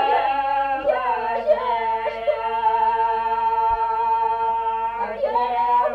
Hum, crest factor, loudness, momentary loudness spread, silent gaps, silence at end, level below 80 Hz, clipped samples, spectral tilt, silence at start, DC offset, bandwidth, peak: 50 Hz at -55 dBFS; 14 dB; -21 LUFS; 4 LU; none; 0 s; -50 dBFS; under 0.1%; -5 dB/octave; 0 s; under 0.1%; 5.2 kHz; -8 dBFS